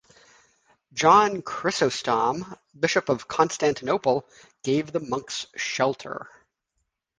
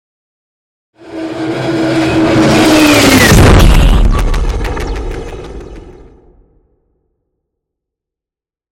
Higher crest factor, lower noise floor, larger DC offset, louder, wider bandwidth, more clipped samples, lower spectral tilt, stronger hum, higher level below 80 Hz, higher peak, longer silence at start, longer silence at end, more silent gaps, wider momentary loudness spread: first, 20 dB vs 12 dB; second, -78 dBFS vs -88 dBFS; neither; second, -24 LUFS vs -9 LUFS; second, 10 kHz vs 17.5 kHz; second, under 0.1% vs 0.2%; about the same, -4 dB/octave vs -5 dB/octave; neither; second, -62 dBFS vs -16 dBFS; second, -4 dBFS vs 0 dBFS; about the same, 0.95 s vs 1.05 s; second, 0.95 s vs 2.8 s; neither; second, 16 LU vs 20 LU